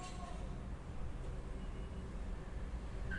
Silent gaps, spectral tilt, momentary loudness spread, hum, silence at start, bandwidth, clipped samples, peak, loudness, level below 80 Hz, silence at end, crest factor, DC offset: none; -6 dB/octave; 1 LU; none; 0 s; 11 kHz; under 0.1%; -30 dBFS; -48 LUFS; -46 dBFS; 0 s; 14 dB; under 0.1%